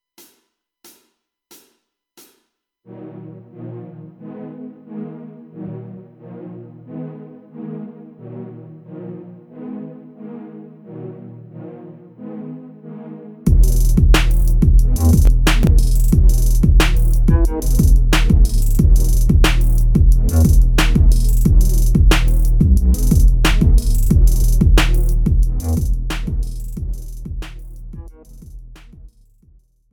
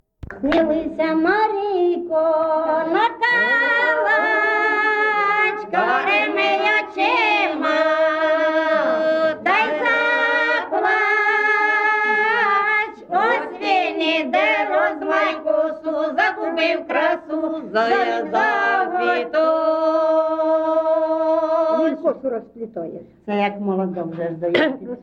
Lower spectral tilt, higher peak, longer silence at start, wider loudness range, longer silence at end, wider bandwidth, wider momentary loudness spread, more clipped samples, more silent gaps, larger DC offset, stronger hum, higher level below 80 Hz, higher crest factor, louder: about the same, -5.5 dB/octave vs -5 dB/octave; first, -2 dBFS vs -6 dBFS; first, 2.95 s vs 0.25 s; first, 19 LU vs 3 LU; first, 0.85 s vs 0 s; first, 17 kHz vs 7.8 kHz; first, 22 LU vs 6 LU; neither; neither; neither; neither; first, -16 dBFS vs -56 dBFS; about the same, 14 dB vs 14 dB; about the same, -16 LUFS vs -18 LUFS